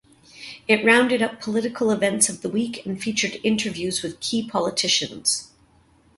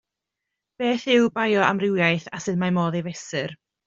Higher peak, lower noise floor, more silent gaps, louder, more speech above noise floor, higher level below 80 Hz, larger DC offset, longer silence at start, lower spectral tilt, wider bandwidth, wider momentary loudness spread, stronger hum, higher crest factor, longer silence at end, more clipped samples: about the same, -2 dBFS vs -4 dBFS; second, -57 dBFS vs -84 dBFS; neither; about the same, -22 LUFS vs -22 LUFS; second, 35 dB vs 62 dB; about the same, -62 dBFS vs -64 dBFS; neither; second, 0.35 s vs 0.8 s; second, -2.5 dB/octave vs -5.5 dB/octave; first, 12 kHz vs 7.6 kHz; about the same, 10 LU vs 10 LU; neither; about the same, 20 dB vs 20 dB; first, 0.7 s vs 0.3 s; neither